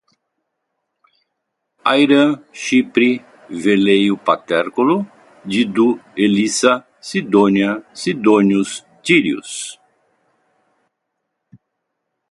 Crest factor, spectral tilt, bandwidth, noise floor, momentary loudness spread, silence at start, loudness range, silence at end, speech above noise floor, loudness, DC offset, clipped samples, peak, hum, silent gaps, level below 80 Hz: 18 dB; -4.5 dB/octave; 11.5 kHz; -75 dBFS; 12 LU; 1.85 s; 5 LU; 2.55 s; 60 dB; -16 LUFS; under 0.1%; under 0.1%; 0 dBFS; none; none; -62 dBFS